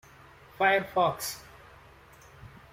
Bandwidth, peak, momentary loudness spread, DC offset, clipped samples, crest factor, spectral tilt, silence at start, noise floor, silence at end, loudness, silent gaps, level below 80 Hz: 16 kHz; -12 dBFS; 18 LU; under 0.1%; under 0.1%; 20 dB; -3.5 dB/octave; 0.6 s; -54 dBFS; 0.25 s; -27 LUFS; none; -62 dBFS